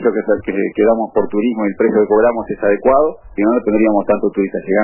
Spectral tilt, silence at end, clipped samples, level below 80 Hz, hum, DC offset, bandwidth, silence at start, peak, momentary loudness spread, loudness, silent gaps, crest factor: -12 dB/octave; 0 s; under 0.1%; -44 dBFS; none; under 0.1%; 3.1 kHz; 0 s; -2 dBFS; 6 LU; -15 LUFS; none; 12 dB